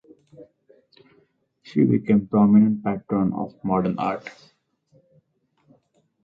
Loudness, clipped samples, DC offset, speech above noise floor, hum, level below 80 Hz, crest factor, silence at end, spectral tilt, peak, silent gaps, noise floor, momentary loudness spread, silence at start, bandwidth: -21 LUFS; under 0.1%; under 0.1%; 47 dB; none; -58 dBFS; 18 dB; 1.95 s; -10 dB/octave; -6 dBFS; none; -67 dBFS; 12 LU; 0.4 s; 5.2 kHz